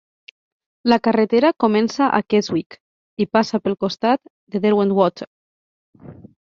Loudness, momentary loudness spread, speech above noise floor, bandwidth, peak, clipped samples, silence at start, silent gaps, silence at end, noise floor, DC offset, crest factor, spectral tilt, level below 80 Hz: -19 LUFS; 11 LU; over 72 dB; 7.2 kHz; -2 dBFS; under 0.1%; 0.85 s; 2.66-2.70 s, 2.80-3.17 s, 4.30-4.47 s, 5.27-5.93 s; 0.35 s; under -90 dBFS; under 0.1%; 18 dB; -6 dB/octave; -60 dBFS